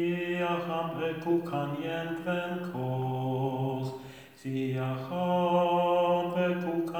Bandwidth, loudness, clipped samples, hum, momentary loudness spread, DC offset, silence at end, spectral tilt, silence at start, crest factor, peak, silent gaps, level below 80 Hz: over 20 kHz; -30 LUFS; under 0.1%; none; 9 LU; under 0.1%; 0 s; -7.5 dB/octave; 0 s; 14 dB; -16 dBFS; none; -70 dBFS